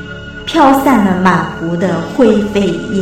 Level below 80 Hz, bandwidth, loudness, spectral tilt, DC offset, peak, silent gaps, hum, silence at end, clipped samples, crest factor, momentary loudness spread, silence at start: -36 dBFS; 16.5 kHz; -12 LUFS; -6.5 dB/octave; under 0.1%; 0 dBFS; none; none; 0 s; 0.2%; 12 dB; 8 LU; 0 s